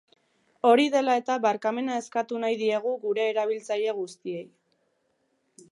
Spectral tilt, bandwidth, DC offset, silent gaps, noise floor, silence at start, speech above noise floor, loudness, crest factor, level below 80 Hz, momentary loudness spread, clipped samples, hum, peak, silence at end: -4 dB/octave; 11 kHz; under 0.1%; none; -72 dBFS; 0.65 s; 47 dB; -26 LUFS; 20 dB; -84 dBFS; 13 LU; under 0.1%; none; -6 dBFS; 1.25 s